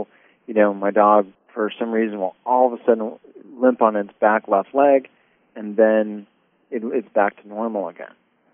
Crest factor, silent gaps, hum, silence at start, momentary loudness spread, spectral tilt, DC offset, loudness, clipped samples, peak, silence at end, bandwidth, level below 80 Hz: 20 dB; none; none; 0 s; 15 LU; -1 dB/octave; under 0.1%; -20 LUFS; under 0.1%; 0 dBFS; 0.45 s; 3.6 kHz; -82 dBFS